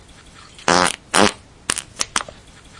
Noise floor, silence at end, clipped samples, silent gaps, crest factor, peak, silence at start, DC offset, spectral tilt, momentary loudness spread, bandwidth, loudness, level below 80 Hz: -44 dBFS; 0.55 s; under 0.1%; none; 22 dB; 0 dBFS; 0.6 s; under 0.1%; -2 dB/octave; 9 LU; 11.5 kHz; -19 LUFS; -48 dBFS